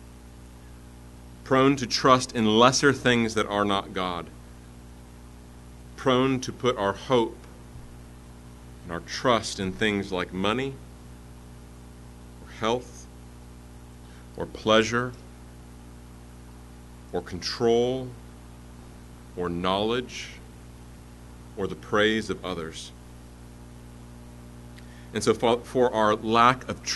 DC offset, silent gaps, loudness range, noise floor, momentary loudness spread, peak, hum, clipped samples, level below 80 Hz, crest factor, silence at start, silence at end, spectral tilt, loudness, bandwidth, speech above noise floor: under 0.1%; none; 10 LU; -46 dBFS; 26 LU; -4 dBFS; 60 Hz at -45 dBFS; under 0.1%; -48 dBFS; 24 dB; 0 s; 0 s; -4.5 dB/octave; -25 LUFS; 12 kHz; 21 dB